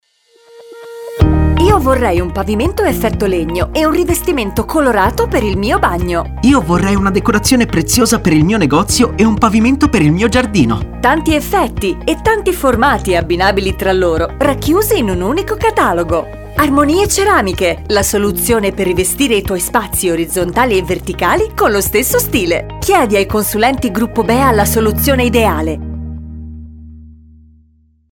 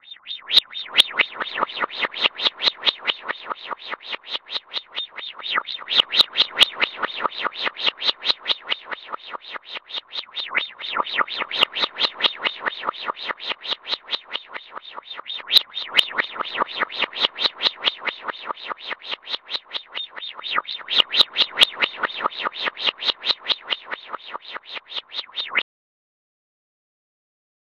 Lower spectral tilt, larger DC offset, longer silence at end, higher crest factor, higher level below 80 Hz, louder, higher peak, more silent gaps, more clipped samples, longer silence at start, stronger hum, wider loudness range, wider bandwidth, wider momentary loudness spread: first, -5 dB/octave vs 0 dB/octave; neither; second, 1.05 s vs 2 s; second, 12 dB vs 26 dB; first, -24 dBFS vs -70 dBFS; first, -13 LUFS vs -22 LUFS; about the same, 0 dBFS vs 0 dBFS; neither; neither; first, 0.55 s vs 0.05 s; neither; second, 3 LU vs 7 LU; first, 19.5 kHz vs 13 kHz; second, 6 LU vs 15 LU